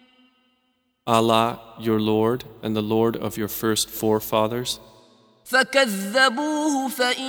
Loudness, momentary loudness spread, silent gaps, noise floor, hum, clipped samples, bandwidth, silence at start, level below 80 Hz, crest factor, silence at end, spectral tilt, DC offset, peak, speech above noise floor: -22 LUFS; 9 LU; none; -70 dBFS; none; under 0.1%; over 20 kHz; 1.05 s; -58 dBFS; 20 dB; 0 s; -4 dB/octave; under 0.1%; -2 dBFS; 48 dB